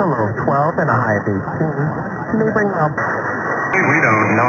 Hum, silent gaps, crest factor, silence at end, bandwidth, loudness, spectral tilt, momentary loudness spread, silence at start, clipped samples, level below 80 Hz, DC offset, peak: none; none; 16 dB; 0 s; 7 kHz; -17 LUFS; -8 dB/octave; 8 LU; 0 s; under 0.1%; -50 dBFS; under 0.1%; -2 dBFS